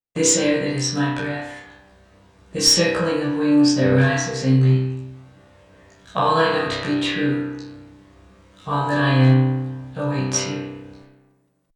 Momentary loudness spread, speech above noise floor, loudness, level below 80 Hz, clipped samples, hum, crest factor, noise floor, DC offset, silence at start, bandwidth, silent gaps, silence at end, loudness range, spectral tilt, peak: 18 LU; 44 dB; -19 LUFS; -54 dBFS; under 0.1%; none; 18 dB; -62 dBFS; under 0.1%; 0.15 s; 17.5 kHz; none; 0.8 s; 5 LU; -4.5 dB/octave; -4 dBFS